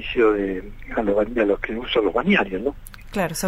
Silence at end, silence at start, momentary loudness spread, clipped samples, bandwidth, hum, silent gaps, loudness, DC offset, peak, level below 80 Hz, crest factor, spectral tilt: 0 s; 0 s; 10 LU; under 0.1%; 16 kHz; none; none; -22 LUFS; under 0.1%; -6 dBFS; -38 dBFS; 16 dB; -5 dB/octave